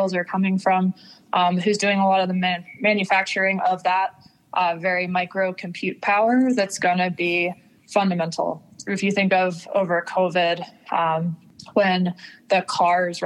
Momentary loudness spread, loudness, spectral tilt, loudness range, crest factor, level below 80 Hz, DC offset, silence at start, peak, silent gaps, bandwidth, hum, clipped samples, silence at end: 8 LU; -22 LUFS; -5 dB/octave; 2 LU; 16 dB; -74 dBFS; under 0.1%; 0 s; -6 dBFS; none; 12 kHz; none; under 0.1%; 0 s